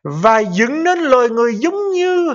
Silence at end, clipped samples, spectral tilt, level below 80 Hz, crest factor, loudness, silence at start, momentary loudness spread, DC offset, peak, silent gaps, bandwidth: 0 s; under 0.1%; -5.5 dB/octave; -56 dBFS; 14 dB; -14 LUFS; 0.05 s; 4 LU; under 0.1%; 0 dBFS; none; 7.6 kHz